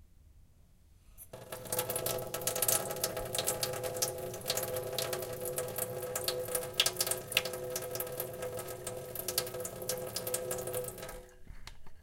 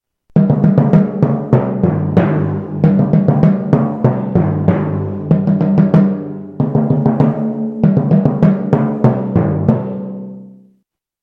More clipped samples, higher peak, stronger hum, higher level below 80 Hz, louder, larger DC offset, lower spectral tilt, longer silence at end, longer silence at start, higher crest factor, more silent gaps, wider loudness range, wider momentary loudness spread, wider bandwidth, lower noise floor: neither; second, -10 dBFS vs 0 dBFS; neither; second, -58 dBFS vs -44 dBFS; second, -35 LUFS vs -14 LUFS; neither; second, -2 dB/octave vs -11.5 dB/octave; second, 0 s vs 0.75 s; second, 0 s vs 0.35 s; first, 28 dB vs 12 dB; neither; first, 4 LU vs 1 LU; first, 16 LU vs 8 LU; first, 17 kHz vs 4.2 kHz; about the same, -61 dBFS vs -62 dBFS